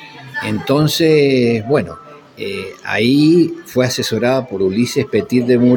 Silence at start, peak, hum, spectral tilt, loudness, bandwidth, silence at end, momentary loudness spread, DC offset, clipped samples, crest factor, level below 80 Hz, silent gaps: 0 s; -2 dBFS; none; -5.5 dB/octave; -15 LUFS; 17 kHz; 0 s; 13 LU; under 0.1%; under 0.1%; 14 dB; -52 dBFS; none